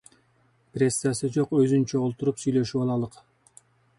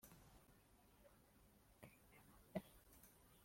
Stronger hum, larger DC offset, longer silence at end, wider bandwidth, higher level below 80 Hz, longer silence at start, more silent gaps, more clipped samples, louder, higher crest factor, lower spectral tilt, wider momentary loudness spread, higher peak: neither; neither; first, 0.9 s vs 0 s; second, 11.5 kHz vs 16.5 kHz; first, -62 dBFS vs -76 dBFS; first, 0.75 s vs 0 s; neither; neither; first, -25 LUFS vs -61 LUFS; second, 16 dB vs 30 dB; about the same, -6 dB/octave vs -5.5 dB/octave; second, 7 LU vs 14 LU; first, -10 dBFS vs -32 dBFS